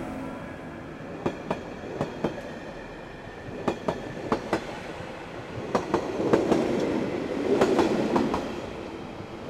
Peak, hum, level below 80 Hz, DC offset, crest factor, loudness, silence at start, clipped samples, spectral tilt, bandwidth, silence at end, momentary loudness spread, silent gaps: -6 dBFS; none; -52 dBFS; under 0.1%; 22 dB; -29 LUFS; 0 s; under 0.1%; -6 dB/octave; 13.5 kHz; 0 s; 15 LU; none